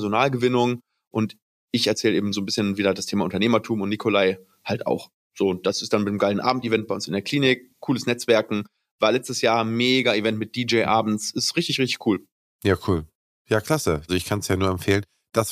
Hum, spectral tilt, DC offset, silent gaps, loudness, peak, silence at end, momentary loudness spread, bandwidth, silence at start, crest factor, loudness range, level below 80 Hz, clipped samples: none; -4.5 dB/octave; under 0.1%; 1.07-1.11 s, 1.42-1.68 s, 5.14-5.30 s, 8.91-8.99 s, 12.32-12.59 s, 13.15-13.45 s; -23 LUFS; -4 dBFS; 0 s; 7 LU; 15.5 kHz; 0 s; 18 dB; 3 LU; -54 dBFS; under 0.1%